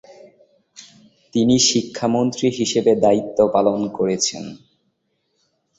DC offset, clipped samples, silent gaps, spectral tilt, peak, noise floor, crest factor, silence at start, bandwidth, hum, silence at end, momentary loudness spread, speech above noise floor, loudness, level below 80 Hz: under 0.1%; under 0.1%; none; -4 dB/octave; -2 dBFS; -70 dBFS; 18 dB; 0.1 s; 8 kHz; none; 1.2 s; 7 LU; 52 dB; -18 LUFS; -56 dBFS